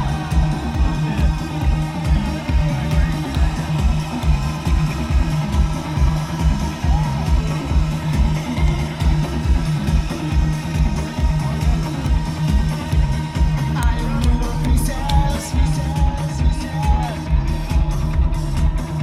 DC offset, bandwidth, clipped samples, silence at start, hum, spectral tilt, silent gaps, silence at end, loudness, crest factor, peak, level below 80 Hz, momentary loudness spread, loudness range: 0.2%; 13.5 kHz; under 0.1%; 0 s; none; -6.5 dB/octave; none; 0 s; -20 LUFS; 14 dB; -4 dBFS; -20 dBFS; 2 LU; 1 LU